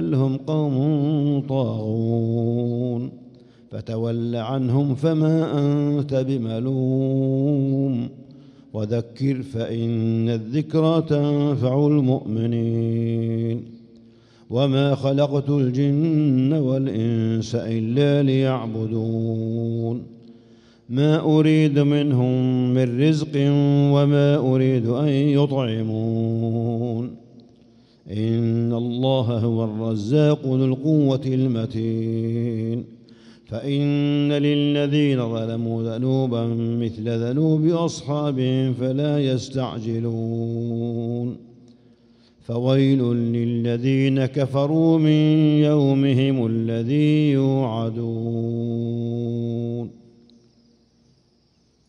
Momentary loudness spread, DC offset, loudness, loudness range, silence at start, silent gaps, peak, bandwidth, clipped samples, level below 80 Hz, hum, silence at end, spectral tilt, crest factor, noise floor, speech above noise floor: 8 LU; under 0.1%; -21 LUFS; 6 LU; 0 s; none; -6 dBFS; 7.6 kHz; under 0.1%; -62 dBFS; none; 2 s; -8.5 dB/octave; 14 dB; -62 dBFS; 41 dB